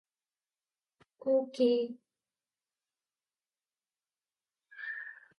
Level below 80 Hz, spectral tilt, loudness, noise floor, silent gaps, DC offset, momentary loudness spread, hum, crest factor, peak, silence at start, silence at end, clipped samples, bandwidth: under -90 dBFS; -5 dB/octave; -33 LUFS; under -90 dBFS; none; under 0.1%; 15 LU; none; 20 dB; -18 dBFS; 1.25 s; 0.25 s; under 0.1%; 10.5 kHz